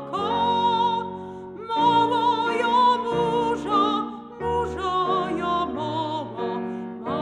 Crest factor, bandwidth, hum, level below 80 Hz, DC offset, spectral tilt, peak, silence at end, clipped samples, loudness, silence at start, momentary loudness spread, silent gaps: 14 dB; 10 kHz; none; -52 dBFS; under 0.1%; -5.5 dB/octave; -8 dBFS; 0 s; under 0.1%; -23 LUFS; 0 s; 12 LU; none